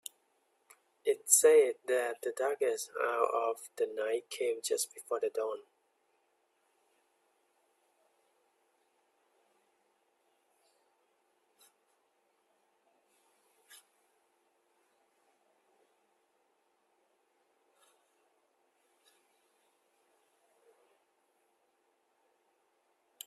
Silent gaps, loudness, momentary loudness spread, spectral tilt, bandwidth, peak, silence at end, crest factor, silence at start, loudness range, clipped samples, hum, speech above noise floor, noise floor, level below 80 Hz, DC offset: none; -31 LUFS; 13 LU; 0.5 dB/octave; 14.5 kHz; -8 dBFS; 9.5 s; 30 dB; 1.05 s; 13 LU; under 0.1%; none; 45 dB; -76 dBFS; under -90 dBFS; under 0.1%